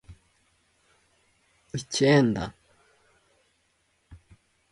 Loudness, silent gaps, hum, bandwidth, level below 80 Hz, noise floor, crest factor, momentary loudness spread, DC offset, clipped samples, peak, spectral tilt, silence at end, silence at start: -25 LUFS; none; none; 11.5 kHz; -58 dBFS; -70 dBFS; 22 dB; 18 LU; under 0.1%; under 0.1%; -8 dBFS; -5.5 dB/octave; 0.55 s; 0.1 s